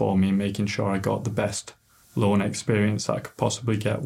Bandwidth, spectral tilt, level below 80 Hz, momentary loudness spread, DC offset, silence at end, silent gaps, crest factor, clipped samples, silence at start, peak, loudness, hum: 15 kHz; -6 dB/octave; -58 dBFS; 6 LU; under 0.1%; 0 s; none; 18 dB; under 0.1%; 0 s; -6 dBFS; -25 LUFS; none